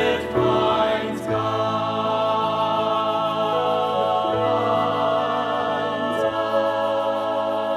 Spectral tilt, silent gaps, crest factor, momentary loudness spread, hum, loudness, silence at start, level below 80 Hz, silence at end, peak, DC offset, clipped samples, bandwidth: -6 dB/octave; none; 14 dB; 3 LU; none; -22 LUFS; 0 s; -54 dBFS; 0 s; -8 dBFS; under 0.1%; under 0.1%; 13 kHz